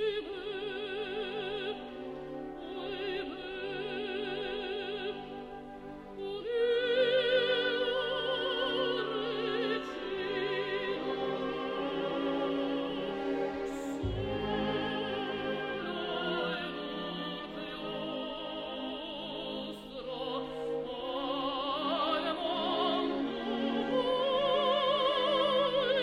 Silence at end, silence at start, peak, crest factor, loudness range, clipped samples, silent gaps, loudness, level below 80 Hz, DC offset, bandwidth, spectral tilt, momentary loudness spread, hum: 0 s; 0 s; -18 dBFS; 16 dB; 8 LU; under 0.1%; none; -33 LUFS; -58 dBFS; under 0.1%; 12 kHz; -5.5 dB/octave; 11 LU; none